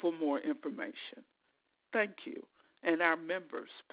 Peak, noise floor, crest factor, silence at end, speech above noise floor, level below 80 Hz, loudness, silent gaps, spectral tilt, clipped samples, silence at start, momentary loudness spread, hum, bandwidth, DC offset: -14 dBFS; -78 dBFS; 22 dB; 0.1 s; 43 dB; -90 dBFS; -35 LUFS; none; -2 dB/octave; under 0.1%; 0 s; 16 LU; none; 4 kHz; under 0.1%